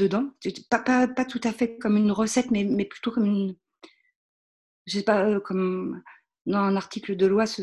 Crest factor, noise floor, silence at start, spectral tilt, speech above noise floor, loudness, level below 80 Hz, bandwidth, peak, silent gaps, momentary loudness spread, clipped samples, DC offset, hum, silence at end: 18 dB; under -90 dBFS; 0 s; -5.5 dB/octave; over 66 dB; -25 LUFS; -62 dBFS; 12 kHz; -6 dBFS; 4.16-4.85 s, 6.41-6.45 s; 9 LU; under 0.1%; under 0.1%; none; 0 s